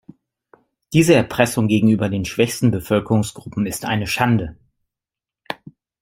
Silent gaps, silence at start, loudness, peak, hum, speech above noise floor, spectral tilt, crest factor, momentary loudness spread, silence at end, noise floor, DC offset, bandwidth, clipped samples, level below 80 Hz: none; 0.9 s; -18 LUFS; -2 dBFS; none; 71 dB; -5.5 dB/octave; 18 dB; 16 LU; 0.45 s; -88 dBFS; under 0.1%; 16.5 kHz; under 0.1%; -48 dBFS